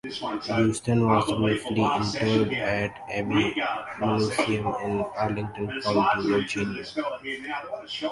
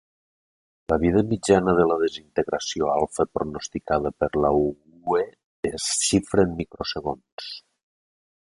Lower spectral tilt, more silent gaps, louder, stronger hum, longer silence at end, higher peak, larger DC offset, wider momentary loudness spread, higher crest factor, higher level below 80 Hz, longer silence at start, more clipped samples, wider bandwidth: about the same, -5.5 dB/octave vs -4.5 dB/octave; second, none vs 5.44-5.63 s, 7.32-7.38 s; about the same, -26 LUFS vs -24 LUFS; neither; second, 0 s vs 0.9 s; second, -8 dBFS vs -4 dBFS; neither; second, 9 LU vs 13 LU; about the same, 18 dB vs 20 dB; second, -52 dBFS vs -46 dBFS; second, 0.05 s vs 0.9 s; neither; about the same, 11.5 kHz vs 11.5 kHz